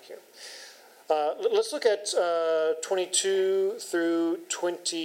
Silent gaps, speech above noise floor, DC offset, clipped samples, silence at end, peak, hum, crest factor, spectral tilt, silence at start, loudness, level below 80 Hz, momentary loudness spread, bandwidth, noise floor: none; 23 dB; under 0.1%; under 0.1%; 0 s; -10 dBFS; none; 18 dB; -1.5 dB/octave; 0.05 s; -27 LUFS; under -90 dBFS; 18 LU; 16 kHz; -50 dBFS